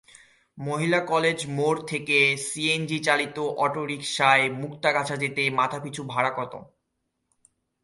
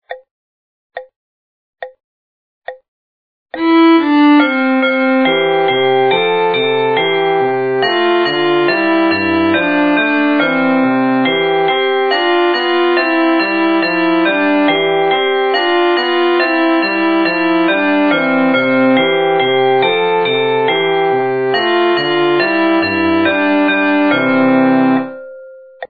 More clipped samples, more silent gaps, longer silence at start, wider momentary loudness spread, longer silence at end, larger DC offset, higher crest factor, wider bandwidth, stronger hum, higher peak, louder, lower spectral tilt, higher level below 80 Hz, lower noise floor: neither; second, none vs 0.31-0.90 s, 1.16-1.73 s, 2.04-2.62 s, 2.88-3.46 s; first, 0.55 s vs 0.1 s; first, 10 LU vs 4 LU; first, 1.2 s vs 0.05 s; second, under 0.1% vs 0.6%; first, 20 dB vs 12 dB; first, 11.5 kHz vs 5 kHz; neither; second, -6 dBFS vs 0 dBFS; second, -24 LUFS vs -12 LUFS; second, -4 dB/octave vs -7.5 dB/octave; about the same, -68 dBFS vs -64 dBFS; first, -78 dBFS vs -35 dBFS